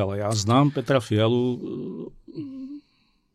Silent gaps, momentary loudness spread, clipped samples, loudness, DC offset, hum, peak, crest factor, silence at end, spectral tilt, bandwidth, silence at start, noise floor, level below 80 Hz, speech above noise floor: none; 18 LU; under 0.1%; -23 LUFS; under 0.1%; none; -8 dBFS; 16 dB; 0.55 s; -6 dB/octave; 12.5 kHz; 0 s; -66 dBFS; -60 dBFS; 43 dB